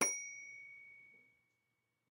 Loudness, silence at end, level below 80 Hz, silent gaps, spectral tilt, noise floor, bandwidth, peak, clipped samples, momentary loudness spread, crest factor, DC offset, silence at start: -43 LUFS; 0.95 s; under -90 dBFS; none; 0 dB/octave; -85 dBFS; 16 kHz; -20 dBFS; under 0.1%; 20 LU; 26 dB; under 0.1%; 0 s